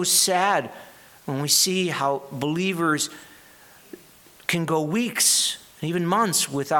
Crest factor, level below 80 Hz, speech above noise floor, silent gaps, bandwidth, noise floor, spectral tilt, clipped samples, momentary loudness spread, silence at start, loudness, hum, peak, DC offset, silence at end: 20 dB; -68 dBFS; 28 dB; none; 19 kHz; -51 dBFS; -2.5 dB/octave; under 0.1%; 11 LU; 0 s; -22 LUFS; none; -4 dBFS; under 0.1%; 0 s